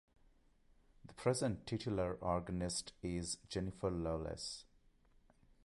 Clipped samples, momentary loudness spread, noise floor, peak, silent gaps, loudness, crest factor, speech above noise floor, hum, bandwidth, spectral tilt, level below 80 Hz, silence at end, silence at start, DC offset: under 0.1%; 6 LU; -70 dBFS; -22 dBFS; none; -41 LUFS; 20 dB; 30 dB; none; 11.5 kHz; -5 dB/octave; -58 dBFS; 1 s; 1.05 s; under 0.1%